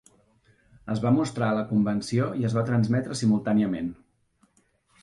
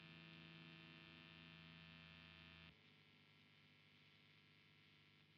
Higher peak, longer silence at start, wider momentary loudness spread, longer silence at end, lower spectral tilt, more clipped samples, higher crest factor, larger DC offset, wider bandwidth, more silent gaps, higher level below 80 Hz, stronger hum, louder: first, -12 dBFS vs -48 dBFS; first, 0.85 s vs 0 s; about the same, 8 LU vs 9 LU; first, 1.1 s vs 0 s; first, -7 dB/octave vs -3 dB/octave; neither; about the same, 16 dB vs 18 dB; neither; first, 11.5 kHz vs 6 kHz; neither; first, -58 dBFS vs -84 dBFS; second, none vs 50 Hz at -85 dBFS; first, -25 LUFS vs -63 LUFS